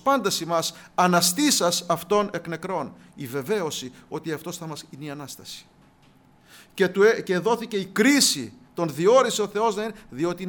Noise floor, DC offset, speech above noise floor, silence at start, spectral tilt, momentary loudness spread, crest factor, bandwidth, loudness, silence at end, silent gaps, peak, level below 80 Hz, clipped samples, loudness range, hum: -56 dBFS; under 0.1%; 32 dB; 0.05 s; -3.5 dB/octave; 18 LU; 18 dB; over 20 kHz; -23 LUFS; 0 s; none; -6 dBFS; -64 dBFS; under 0.1%; 11 LU; none